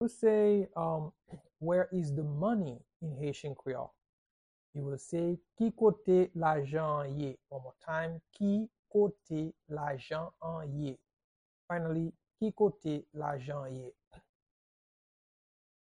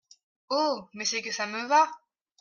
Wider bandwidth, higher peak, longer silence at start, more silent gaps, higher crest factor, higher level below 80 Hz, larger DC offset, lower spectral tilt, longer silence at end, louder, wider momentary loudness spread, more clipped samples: first, 10.5 kHz vs 7.4 kHz; second, -16 dBFS vs -10 dBFS; second, 0 s vs 0.5 s; first, 2.96-3.00 s, 4.09-4.73 s, 8.79-8.83 s, 11.13-11.17 s, 11.24-11.68 s, 14.07-14.11 s vs none; about the same, 18 dB vs 20 dB; first, -68 dBFS vs -80 dBFS; neither; first, -8 dB/octave vs -1.5 dB/octave; first, 1.65 s vs 0.45 s; second, -34 LUFS vs -27 LUFS; first, 14 LU vs 8 LU; neither